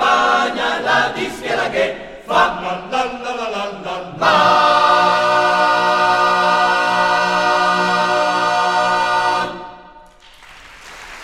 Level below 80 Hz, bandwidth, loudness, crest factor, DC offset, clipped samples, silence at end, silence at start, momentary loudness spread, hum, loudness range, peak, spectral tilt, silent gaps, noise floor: -50 dBFS; 15.5 kHz; -15 LUFS; 16 dB; under 0.1%; under 0.1%; 0 s; 0 s; 12 LU; none; 5 LU; 0 dBFS; -3 dB/octave; none; -43 dBFS